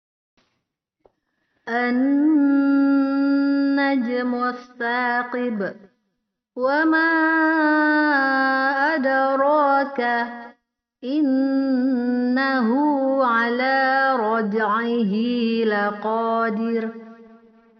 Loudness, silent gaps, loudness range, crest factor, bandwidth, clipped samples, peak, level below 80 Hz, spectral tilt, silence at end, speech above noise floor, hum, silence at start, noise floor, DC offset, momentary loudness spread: -20 LUFS; none; 4 LU; 14 dB; 5.8 kHz; under 0.1%; -8 dBFS; -72 dBFS; -3 dB/octave; 0.55 s; 57 dB; none; 1.65 s; -77 dBFS; under 0.1%; 8 LU